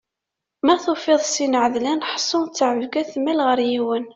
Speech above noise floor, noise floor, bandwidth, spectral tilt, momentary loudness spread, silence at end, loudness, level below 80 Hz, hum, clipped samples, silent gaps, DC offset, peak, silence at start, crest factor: 64 dB; -84 dBFS; 8.2 kHz; -2.5 dB/octave; 4 LU; 0.05 s; -20 LUFS; -64 dBFS; none; under 0.1%; none; under 0.1%; -4 dBFS; 0.65 s; 16 dB